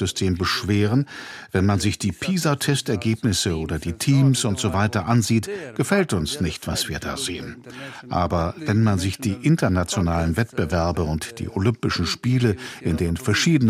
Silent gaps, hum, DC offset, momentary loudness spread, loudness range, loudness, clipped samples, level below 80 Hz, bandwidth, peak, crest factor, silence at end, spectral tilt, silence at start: none; none; under 0.1%; 8 LU; 3 LU; -22 LUFS; under 0.1%; -40 dBFS; 15.5 kHz; -4 dBFS; 16 dB; 0 s; -5 dB/octave; 0 s